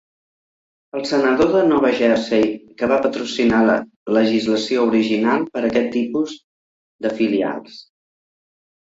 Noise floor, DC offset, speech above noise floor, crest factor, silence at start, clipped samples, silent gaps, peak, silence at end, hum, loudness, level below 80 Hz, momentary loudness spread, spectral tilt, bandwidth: under -90 dBFS; under 0.1%; over 72 dB; 16 dB; 0.95 s; under 0.1%; 3.96-4.06 s, 6.44-6.99 s; -4 dBFS; 1.1 s; none; -18 LUFS; -56 dBFS; 9 LU; -5.5 dB/octave; 8 kHz